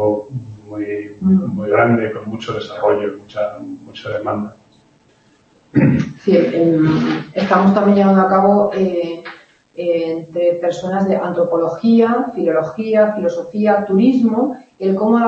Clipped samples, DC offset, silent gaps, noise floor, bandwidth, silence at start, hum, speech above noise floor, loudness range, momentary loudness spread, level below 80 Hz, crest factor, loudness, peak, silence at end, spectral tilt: under 0.1%; under 0.1%; none; -53 dBFS; 7.6 kHz; 0 s; none; 38 dB; 8 LU; 13 LU; -54 dBFS; 16 dB; -16 LUFS; 0 dBFS; 0 s; -8.5 dB/octave